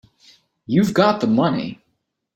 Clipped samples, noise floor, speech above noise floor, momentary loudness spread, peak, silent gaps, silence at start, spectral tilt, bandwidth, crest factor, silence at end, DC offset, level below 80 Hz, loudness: under 0.1%; -72 dBFS; 55 dB; 9 LU; -2 dBFS; none; 0.7 s; -7 dB/octave; 16.5 kHz; 20 dB; 0.6 s; under 0.1%; -58 dBFS; -18 LUFS